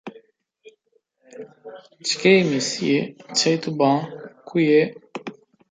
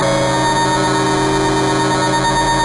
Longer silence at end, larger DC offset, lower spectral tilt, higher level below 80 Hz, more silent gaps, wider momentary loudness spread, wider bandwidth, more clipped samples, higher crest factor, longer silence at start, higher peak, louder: first, 0.4 s vs 0 s; neither; about the same, -4.5 dB/octave vs -4 dB/octave; second, -70 dBFS vs -34 dBFS; neither; first, 25 LU vs 1 LU; second, 9.6 kHz vs 11.5 kHz; neither; first, 20 dB vs 8 dB; about the same, 0.05 s vs 0 s; about the same, -4 dBFS vs -6 dBFS; second, -20 LUFS vs -15 LUFS